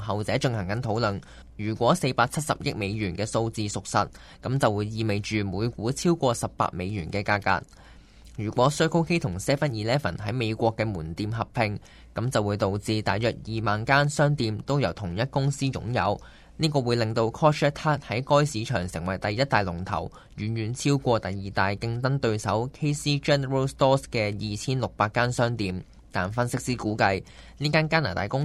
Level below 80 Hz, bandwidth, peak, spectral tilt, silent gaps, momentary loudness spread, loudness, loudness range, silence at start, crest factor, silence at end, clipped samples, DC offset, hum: -48 dBFS; 13 kHz; -6 dBFS; -5.5 dB/octave; none; 8 LU; -26 LUFS; 2 LU; 0 s; 20 dB; 0 s; under 0.1%; under 0.1%; none